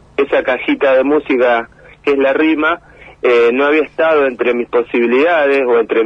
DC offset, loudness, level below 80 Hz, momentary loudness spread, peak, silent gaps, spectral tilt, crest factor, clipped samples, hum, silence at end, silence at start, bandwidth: under 0.1%; -13 LUFS; -50 dBFS; 6 LU; -2 dBFS; none; -6 dB/octave; 12 dB; under 0.1%; none; 0 s; 0.2 s; 6.6 kHz